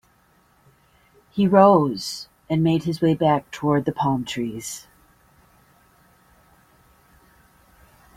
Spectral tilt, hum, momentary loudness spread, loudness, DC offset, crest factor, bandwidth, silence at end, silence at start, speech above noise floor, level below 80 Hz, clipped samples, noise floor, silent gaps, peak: -6.5 dB/octave; none; 18 LU; -21 LUFS; under 0.1%; 22 dB; 16 kHz; 3.35 s; 1.35 s; 40 dB; -58 dBFS; under 0.1%; -60 dBFS; none; -2 dBFS